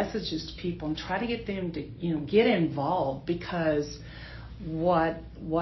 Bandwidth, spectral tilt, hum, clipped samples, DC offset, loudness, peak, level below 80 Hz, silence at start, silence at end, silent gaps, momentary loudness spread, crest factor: 6.2 kHz; -7 dB/octave; none; under 0.1%; under 0.1%; -29 LUFS; -10 dBFS; -48 dBFS; 0 s; 0 s; none; 14 LU; 18 dB